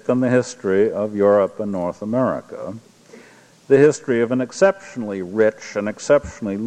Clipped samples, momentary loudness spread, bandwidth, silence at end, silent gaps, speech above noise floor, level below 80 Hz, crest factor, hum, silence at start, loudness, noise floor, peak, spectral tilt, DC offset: under 0.1%; 12 LU; 9.8 kHz; 0 s; none; 29 dB; -54 dBFS; 18 dB; none; 0.05 s; -19 LUFS; -48 dBFS; -2 dBFS; -6 dB/octave; under 0.1%